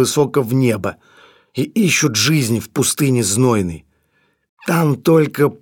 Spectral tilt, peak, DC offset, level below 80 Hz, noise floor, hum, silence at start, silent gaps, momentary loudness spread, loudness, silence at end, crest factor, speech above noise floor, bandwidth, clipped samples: -4.5 dB/octave; -2 dBFS; under 0.1%; -52 dBFS; -62 dBFS; none; 0 s; 4.49-4.57 s; 11 LU; -16 LUFS; 0.05 s; 14 dB; 47 dB; 18 kHz; under 0.1%